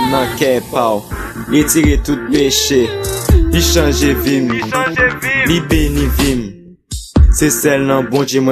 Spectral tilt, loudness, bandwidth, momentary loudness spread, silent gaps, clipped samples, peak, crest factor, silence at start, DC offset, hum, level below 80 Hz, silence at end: -4.5 dB/octave; -13 LUFS; 14 kHz; 7 LU; none; under 0.1%; 0 dBFS; 12 dB; 0 s; under 0.1%; none; -20 dBFS; 0 s